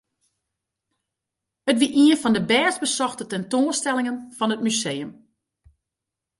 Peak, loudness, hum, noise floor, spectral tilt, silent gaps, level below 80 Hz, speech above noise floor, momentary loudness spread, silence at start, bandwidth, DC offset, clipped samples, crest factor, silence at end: -6 dBFS; -21 LUFS; none; -86 dBFS; -3 dB/octave; none; -66 dBFS; 64 dB; 12 LU; 1.65 s; 11.5 kHz; under 0.1%; under 0.1%; 18 dB; 1.3 s